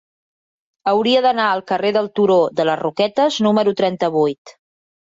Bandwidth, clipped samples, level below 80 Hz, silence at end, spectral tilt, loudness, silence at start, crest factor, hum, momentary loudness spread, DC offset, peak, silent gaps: 7.8 kHz; under 0.1%; -64 dBFS; 0.55 s; -5.5 dB/octave; -17 LUFS; 0.85 s; 14 dB; none; 4 LU; under 0.1%; -4 dBFS; 4.38-4.45 s